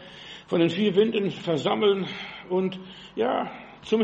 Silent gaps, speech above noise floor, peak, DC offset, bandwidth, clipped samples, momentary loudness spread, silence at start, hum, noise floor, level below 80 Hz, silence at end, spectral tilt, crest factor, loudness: none; 19 dB; -8 dBFS; under 0.1%; 8.4 kHz; under 0.1%; 16 LU; 0 s; none; -44 dBFS; -64 dBFS; 0 s; -6.5 dB/octave; 16 dB; -25 LUFS